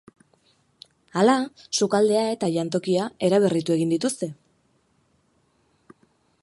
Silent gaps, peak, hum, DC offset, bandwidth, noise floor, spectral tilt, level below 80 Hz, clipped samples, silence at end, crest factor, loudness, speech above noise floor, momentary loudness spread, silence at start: none; -6 dBFS; none; under 0.1%; 11.5 kHz; -66 dBFS; -5 dB/octave; -68 dBFS; under 0.1%; 2.1 s; 20 dB; -23 LUFS; 44 dB; 7 LU; 1.15 s